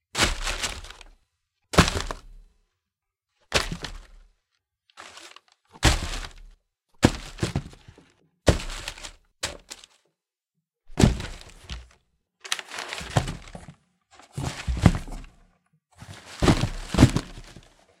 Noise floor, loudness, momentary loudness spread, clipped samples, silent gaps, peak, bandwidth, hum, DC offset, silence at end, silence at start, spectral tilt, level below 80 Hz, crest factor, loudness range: -85 dBFS; -26 LUFS; 23 LU; under 0.1%; none; 0 dBFS; 16.5 kHz; none; under 0.1%; 0.4 s; 0.15 s; -4.5 dB/octave; -36 dBFS; 28 dB; 7 LU